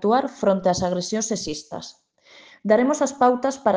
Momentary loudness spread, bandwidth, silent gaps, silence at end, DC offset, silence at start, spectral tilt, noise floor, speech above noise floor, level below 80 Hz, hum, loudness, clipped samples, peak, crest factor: 14 LU; 10 kHz; none; 0 s; under 0.1%; 0 s; -4.5 dB/octave; -50 dBFS; 29 dB; -58 dBFS; none; -22 LUFS; under 0.1%; -4 dBFS; 18 dB